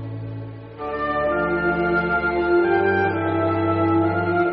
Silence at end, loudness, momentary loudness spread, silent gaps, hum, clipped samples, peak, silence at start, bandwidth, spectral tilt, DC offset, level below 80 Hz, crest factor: 0 s; -20 LUFS; 13 LU; none; none; under 0.1%; -8 dBFS; 0 s; 5 kHz; -6 dB/octave; under 0.1%; -46 dBFS; 12 dB